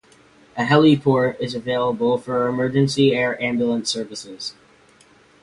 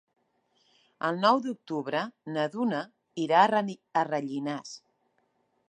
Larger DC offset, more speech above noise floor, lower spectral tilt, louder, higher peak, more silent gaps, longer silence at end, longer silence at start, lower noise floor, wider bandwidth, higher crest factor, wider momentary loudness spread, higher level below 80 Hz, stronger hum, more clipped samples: neither; second, 33 dB vs 45 dB; about the same, -5.5 dB/octave vs -5.5 dB/octave; first, -19 LUFS vs -28 LUFS; first, -2 dBFS vs -8 dBFS; neither; about the same, 0.9 s vs 0.95 s; second, 0.55 s vs 1 s; second, -53 dBFS vs -73 dBFS; about the same, 11.5 kHz vs 10.5 kHz; about the same, 18 dB vs 22 dB; first, 16 LU vs 12 LU; first, -58 dBFS vs -84 dBFS; neither; neither